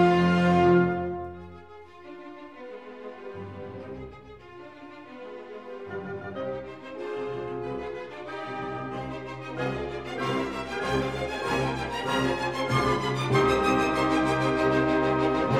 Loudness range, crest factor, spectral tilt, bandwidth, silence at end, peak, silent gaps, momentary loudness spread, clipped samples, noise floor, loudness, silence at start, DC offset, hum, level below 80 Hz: 17 LU; 18 dB; -6.5 dB/octave; 13.5 kHz; 0 s; -10 dBFS; none; 22 LU; under 0.1%; -47 dBFS; -27 LUFS; 0 s; 0.1%; none; -50 dBFS